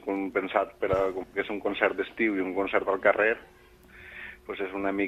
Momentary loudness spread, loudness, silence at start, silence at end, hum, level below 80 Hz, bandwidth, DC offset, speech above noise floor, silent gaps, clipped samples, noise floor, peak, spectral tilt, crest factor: 14 LU; -28 LUFS; 0 s; 0 s; none; -56 dBFS; 14 kHz; under 0.1%; 24 dB; none; under 0.1%; -52 dBFS; -8 dBFS; -6.5 dB/octave; 22 dB